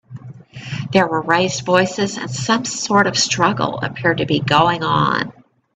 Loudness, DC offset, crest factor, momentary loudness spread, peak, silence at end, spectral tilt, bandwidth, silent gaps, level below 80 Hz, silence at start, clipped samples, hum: -17 LUFS; under 0.1%; 18 dB; 14 LU; 0 dBFS; 0.45 s; -4 dB/octave; 9.4 kHz; none; -52 dBFS; 0.1 s; under 0.1%; none